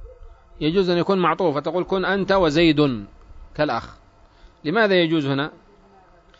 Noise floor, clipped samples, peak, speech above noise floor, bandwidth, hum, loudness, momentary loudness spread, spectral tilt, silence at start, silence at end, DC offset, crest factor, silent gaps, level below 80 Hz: -52 dBFS; under 0.1%; -6 dBFS; 32 dB; 7.8 kHz; none; -20 LUFS; 11 LU; -6.5 dB/octave; 0 s; 0.9 s; under 0.1%; 16 dB; none; -46 dBFS